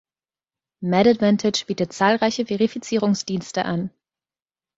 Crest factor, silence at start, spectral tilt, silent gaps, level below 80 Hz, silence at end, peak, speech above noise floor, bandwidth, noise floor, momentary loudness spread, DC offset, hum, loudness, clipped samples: 20 dB; 0.8 s; -5 dB/octave; none; -60 dBFS; 0.9 s; -2 dBFS; over 70 dB; 8 kHz; under -90 dBFS; 9 LU; under 0.1%; none; -21 LUFS; under 0.1%